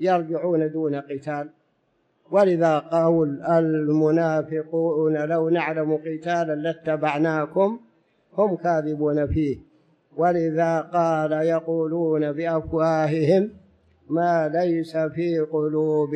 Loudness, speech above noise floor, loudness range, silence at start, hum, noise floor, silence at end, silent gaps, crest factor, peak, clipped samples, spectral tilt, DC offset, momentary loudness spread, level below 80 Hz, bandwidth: -23 LUFS; 46 dB; 3 LU; 0 s; none; -68 dBFS; 0 s; none; 14 dB; -8 dBFS; under 0.1%; -8 dB/octave; under 0.1%; 7 LU; -52 dBFS; 8.6 kHz